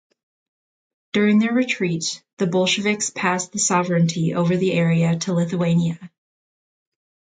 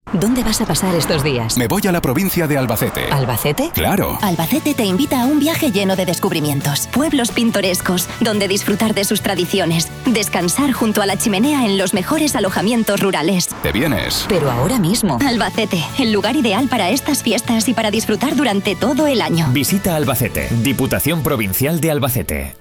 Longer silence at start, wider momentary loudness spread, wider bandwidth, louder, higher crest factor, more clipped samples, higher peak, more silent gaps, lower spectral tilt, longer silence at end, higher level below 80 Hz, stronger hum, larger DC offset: first, 1.15 s vs 0.05 s; first, 7 LU vs 2 LU; second, 9.6 kHz vs 19 kHz; second, -20 LUFS vs -16 LUFS; about the same, 16 dB vs 14 dB; neither; about the same, -4 dBFS vs -4 dBFS; first, 2.33-2.37 s vs none; about the same, -5 dB/octave vs -4.5 dB/octave; first, 1.3 s vs 0.05 s; second, -64 dBFS vs -38 dBFS; neither; neither